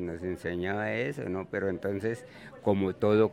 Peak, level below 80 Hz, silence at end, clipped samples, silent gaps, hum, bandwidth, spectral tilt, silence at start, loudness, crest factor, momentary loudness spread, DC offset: -12 dBFS; -62 dBFS; 0 s; under 0.1%; none; none; 13 kHz; -7.5 dB/octave; 0 s; -31 LUFS; 18 dB; 8 LU; under 0.1%